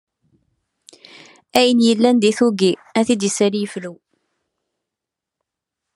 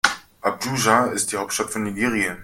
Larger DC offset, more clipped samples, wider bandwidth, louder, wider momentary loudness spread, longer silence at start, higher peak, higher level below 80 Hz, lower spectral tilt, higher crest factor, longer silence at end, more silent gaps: neither; neither; second, 12.5 kHz vs 16.5 kHz; first, -17 LUFS vs -22 LUFS; first, 12 LU vs 8 LU; first, 1.55 s vs 0.05 s; about the same, 0 dBFS vs 0 dBFS; second, -68 dBFS vs -56 dBFS; first, -4.5 dB/octave vs -3 dB/octave; about the same, 20 dB vs 22 dB; first, 2 s vs 0 s; neither